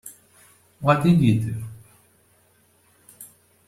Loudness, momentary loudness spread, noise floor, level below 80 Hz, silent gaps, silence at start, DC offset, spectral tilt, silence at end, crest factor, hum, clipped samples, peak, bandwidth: -21 LUFS; 26 LU; -60 dBFS; -54 dBFS; none; 0.05 s; under 0.1%; -7.5 dB/octave; 0.4 s; 20 dB; none; under 0.1%; -4 dBFS; 15 kHz